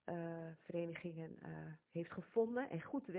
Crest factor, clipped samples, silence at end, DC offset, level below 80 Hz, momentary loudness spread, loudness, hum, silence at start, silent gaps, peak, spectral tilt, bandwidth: 20 dB; under 0.1%; 0 s; under 0.1%; -80 dBFS; 12 LU; -45 LUFS; none; 0.05 s; none; -26 dBFS; -7 dB/octave; 4 kHz